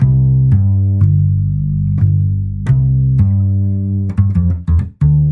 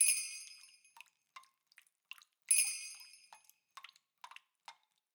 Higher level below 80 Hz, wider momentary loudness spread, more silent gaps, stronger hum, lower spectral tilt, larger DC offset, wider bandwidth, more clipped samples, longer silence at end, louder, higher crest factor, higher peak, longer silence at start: first, -26 dBFS vs under -90 dBFS; second, 5 LU vs 29 LU; neither; neither; first, -12 dB/octave vs 7.5 dB/octave; neither; second, 2.3 kHz vs over 20 kHz; neither; second, 0 s vs 0.45 s; first, -14 LUFS vs -33 LUFS; second, 10 dB vs 26 dB; first, -2 dBFS vs -16 dBFS; about the same, 0 s vs 0 s